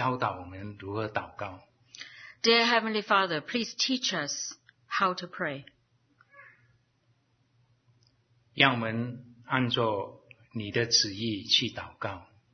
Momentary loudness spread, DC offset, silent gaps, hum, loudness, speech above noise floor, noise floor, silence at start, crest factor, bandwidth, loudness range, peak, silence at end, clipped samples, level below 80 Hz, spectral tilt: 19 LU; under 0.1%; none; none; -28 LUFS; 41 dB; -70 dBFS; 0 s; 26 dB; 6.6 kHz; 9 LU; -6 dBFS; 0.3 s; under 0.1%; -68 dBFS; -3 dB/octave